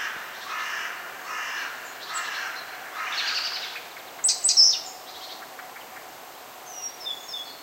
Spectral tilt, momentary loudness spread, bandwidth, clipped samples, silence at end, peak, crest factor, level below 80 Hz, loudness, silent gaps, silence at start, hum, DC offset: 3 dB/octave; 23 LU; 16 kHz; under 0.1%; 0 s; -6 dBFS; 24 dB; -76 dBFS; -25 LUFS; none; 0 s; none; under 0.1%